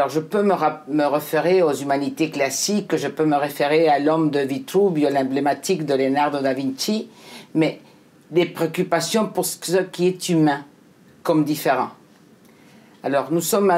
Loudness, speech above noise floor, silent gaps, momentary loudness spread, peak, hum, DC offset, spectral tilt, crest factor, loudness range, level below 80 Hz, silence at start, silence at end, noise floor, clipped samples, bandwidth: -21 LUFS; 31 dB; none; 6 LU; -4 dBFS; none; under 0.1%; -5 dB/octave; 16 dB; 4 LU; -72 dBFS; 0 s; 0 s; -51 dBFS; under 0.1%; 16 kHz